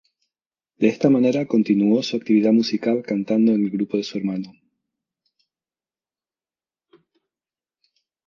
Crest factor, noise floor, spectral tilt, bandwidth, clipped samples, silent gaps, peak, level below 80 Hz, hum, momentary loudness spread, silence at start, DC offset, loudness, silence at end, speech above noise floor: 20 dB; under -90 dBFS; -7 dB/octave; 7.2 kHz; under 0.1%; none; -2 dBFS; -70 dBFS; none; 9 LU; 0.8 s; under 0.1%; -20 LUFS; 3.75 s; over 71 dB